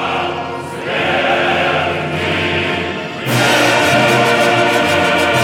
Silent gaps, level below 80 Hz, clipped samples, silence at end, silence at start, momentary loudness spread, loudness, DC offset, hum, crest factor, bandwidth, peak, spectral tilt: none; -54 dBFS; under 0.1%; 0 s; 0 s; 9 LU; -14 LUFS; under 0.1%; none; 14 dB; 18 kHz; 0 dBFS; -4 dB/octave